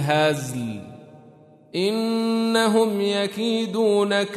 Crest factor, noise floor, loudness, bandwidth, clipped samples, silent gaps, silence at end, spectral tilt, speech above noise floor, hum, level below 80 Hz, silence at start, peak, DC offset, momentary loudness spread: 16 dB; -50 dBFS; -22 LUFS; 13.5 kHz; under 0.1%; none; 0 s; -5 dB/octave; 28 dB; none; -68 dBFS; 0 s; -6 dBFS; under 0.1%; 12 LU